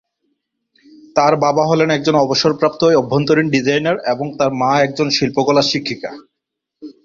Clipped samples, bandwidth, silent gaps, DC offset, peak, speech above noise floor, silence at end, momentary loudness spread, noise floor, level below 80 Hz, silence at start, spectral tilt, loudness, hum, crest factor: under 0.1%; 7.6 kHz; none; under 0.1%; 0 dBFS; 64 dB; 0.15 s; 7 LU; -79 dBFS; -54 dBFS; 1.15 s; -5 dB/octave; -15 LUFS; none; 16 dB